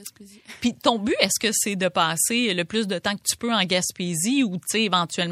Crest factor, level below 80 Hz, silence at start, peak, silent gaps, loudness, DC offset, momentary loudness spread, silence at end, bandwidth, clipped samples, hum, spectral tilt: 22 dB; -62 dBFS; 0 s; -2 dBFS; none; -22 LUFS; under 0.1%; 5 LU; 0 s; 16 kHz; under 0.1%; none; -2.5 dB/octave